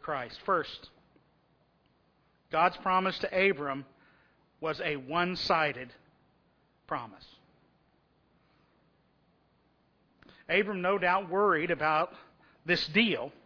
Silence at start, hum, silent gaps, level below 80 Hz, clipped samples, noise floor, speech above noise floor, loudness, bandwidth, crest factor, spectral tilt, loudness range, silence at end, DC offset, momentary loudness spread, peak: 0 s; none; none; -66 dBFS; under 0.1%; -69 dBFS; 39 dB; -29 LUFS; 5.4 kHz; 22 dB; -5.5 dB/octave; 17 LU; 0.15 s; under 0.1%; 12 LU; -10 dBFS